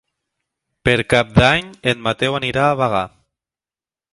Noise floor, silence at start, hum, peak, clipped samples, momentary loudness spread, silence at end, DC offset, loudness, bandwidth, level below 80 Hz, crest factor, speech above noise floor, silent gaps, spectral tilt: under -90 dBFS; 0.85 s; none; 0 dBFS; under 0.1%; 8 LU; 1.05 s; under 0.1%; -17 LUFS; 11.5 kHz; -40 dBFS; 20 dB; over 73 dB; none; -5.5 dB/octave